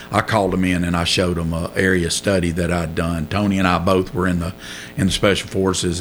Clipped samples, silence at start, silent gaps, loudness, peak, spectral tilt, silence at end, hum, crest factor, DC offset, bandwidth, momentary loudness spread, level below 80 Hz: under 0.1%; 0 s; none; -19 LUFS; -2 dBFS; -5 dB/octave; 0 s; none; 18 dB; under 0.1%; over 20 kHz; 5 LU; -38 dBFS